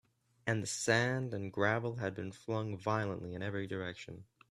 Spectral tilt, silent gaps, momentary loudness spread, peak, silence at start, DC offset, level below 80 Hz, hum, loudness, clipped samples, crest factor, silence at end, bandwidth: -5 dB/octave; none; 13 LU; -14 dBFS; 0.45 s; under 0.1%; -72 dBFS; none; -36 LUFS; under 0.1%; 22 dB; 0.3 s; 13 kHz